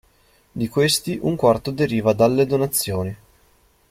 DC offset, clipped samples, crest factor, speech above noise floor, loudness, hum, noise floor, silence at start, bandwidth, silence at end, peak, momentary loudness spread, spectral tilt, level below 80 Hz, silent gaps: under 0.1%; under 0.1%; 18 dB; 38 dB; -20 LUFS; none; -58 dBFS; 0.55 s; 16.5 kHz; 0.75 s; -4 dBFS; 11 LU; -5 dB/octave; -50 dBFS; none